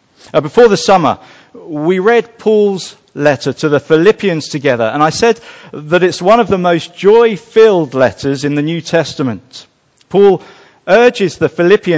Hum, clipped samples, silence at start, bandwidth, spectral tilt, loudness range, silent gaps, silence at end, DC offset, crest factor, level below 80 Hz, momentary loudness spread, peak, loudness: none; 0.1%; 0.35 s; 8 kHz; -5.5 dB/octave; 2 LU; none; 0 s; under 0.1%; 12 dB; -48 dBFS; 10 LU; 0 dBFS; -11 LUFS